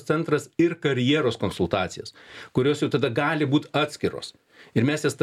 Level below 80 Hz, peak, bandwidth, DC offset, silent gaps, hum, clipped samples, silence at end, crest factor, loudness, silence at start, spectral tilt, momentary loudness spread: -58 dBFS; -6 dBFS; 13.5 kHz; under 0.1%; none; none; under 0.1%; 0 s; 18 dB; -24 LUFS; 0 s; -6 dB/octave; 11 LU